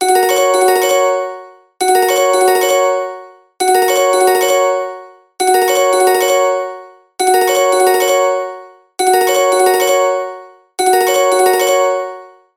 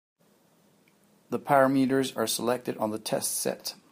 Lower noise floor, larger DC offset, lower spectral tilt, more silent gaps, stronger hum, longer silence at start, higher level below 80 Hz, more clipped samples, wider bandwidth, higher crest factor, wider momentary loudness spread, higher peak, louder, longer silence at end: second, -33 dBFS vs -64 dBFS; neither; second, -0.5 dB/octave vs -4 dB/octave; neither; neither; second, 0 s vs 1.3 s; first, -68 dBFS vs -76 dBFS; neither; about the same, 17 kHz vs 15.5 kHz; second, 12 dB vs 22 dB; first, 14 LU vs 11 LU; first, 0 dBFS vs -8 dBFS; first, -12 LUFS vs -27 LUFS; first, 0.3 s vs 0.15 s